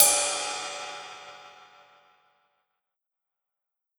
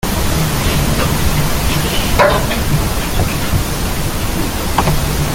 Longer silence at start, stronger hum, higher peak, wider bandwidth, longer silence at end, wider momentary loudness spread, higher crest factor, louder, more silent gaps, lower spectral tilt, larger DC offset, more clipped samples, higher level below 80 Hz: about the same, 0 s vs 0.05 s; neither; about the same, -2 dBFS vs 0 dBFS; first, over 20 kHz vs 17 kHz; first, 2.45 s vs 0 s; first, 25 LU vs 6 LU; first, 30 dB vs 14 dB; second, -26 LUFS vs -16 LUFS; neither; second, 2 dB/octave vs -4.5 dB/octave; neither; neither; second, -72 dBFS vs -20 dBFS